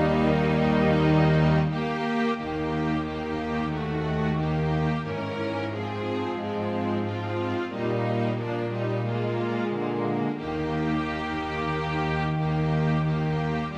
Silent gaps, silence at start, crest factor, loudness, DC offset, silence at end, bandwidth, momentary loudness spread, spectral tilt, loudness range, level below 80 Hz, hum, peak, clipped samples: none; 0 s; 16 dB; -26 LUFS; under 0.1%; 0 s; 7.6 kHz; 8 LU; -8 dB/octave; 4 LU; -44 dBFS; none; -10 dBFS; under 0.1%